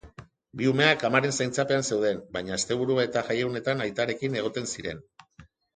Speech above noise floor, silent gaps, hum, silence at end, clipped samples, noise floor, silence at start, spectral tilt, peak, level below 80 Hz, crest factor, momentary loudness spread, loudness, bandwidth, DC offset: 29 dB; none; none; 0.3 s; under 0.1%; -55 dBFS; 0.05 s; -4 dB/octave; -6 dBFS; -60 dBFS; 22 dB; 11 LU; -26 LUFS; 9.6 kHz; under 0.1%